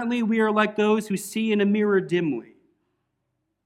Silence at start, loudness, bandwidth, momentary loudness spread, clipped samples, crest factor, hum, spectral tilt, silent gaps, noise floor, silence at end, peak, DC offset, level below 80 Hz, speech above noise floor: 0 s; -23 LUFS; 15.5 kHz; 7 LU; under 0.1%; 18 dB; none; -6 dB/octave; none; -77 dBFS; 1.25 s; -6 dBFS; under 0.1%; -70 dBFS; 54 dB